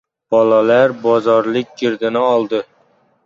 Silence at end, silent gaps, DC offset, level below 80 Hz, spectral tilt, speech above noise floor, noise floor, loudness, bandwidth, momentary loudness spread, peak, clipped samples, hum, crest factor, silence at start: 0.65 s; none; under 0.1%; -64 dBFS; -6.5 dB/octave; 42 dB; -56 dBFS; -15 LUFS; 7.2 kHz; 9 LU; -2 dBFS; under 0.1%; none; 14 dB; 0.3 s